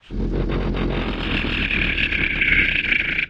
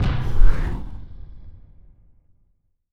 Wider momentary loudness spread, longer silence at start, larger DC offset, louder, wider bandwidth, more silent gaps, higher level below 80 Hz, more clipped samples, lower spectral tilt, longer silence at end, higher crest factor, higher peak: second, 8 LU vs 23 LU; about the same, 0.1 s vs 0 s; neither; first, -20 LUFS vs -26 LUFS; first, 7.2 kHz vs 4.8 kHz; neither; second, -28 dBFS vs -22 dBFS; neither; about the same, -6.5 dB/octave vs -7.5 dB/octave; second, 0 s vs 1.4 s; about the same, 16 dB vs 18 dB; about the same, -4 dBFS vs -2 dBFS